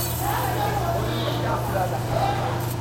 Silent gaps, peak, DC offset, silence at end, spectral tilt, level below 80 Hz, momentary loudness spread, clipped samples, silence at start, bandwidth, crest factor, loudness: none; -10 dBFS; under 0.1%; 0 s; -5 dB/octave; -40 dBFS; 1 LU; under 0.1%; 0 s; 16.5 kHz; 14 dB; -24 LUFS